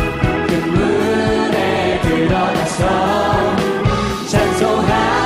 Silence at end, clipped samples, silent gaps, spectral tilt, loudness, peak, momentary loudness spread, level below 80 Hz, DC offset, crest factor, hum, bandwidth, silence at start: 0 s; under 0.1%; none; -5.5 dB/octave; -16 LUFS; 0 dBFS; 3 LU; -30 dBFS; under 0.1%; 14 dB; none; 15.5 kHz; 0 s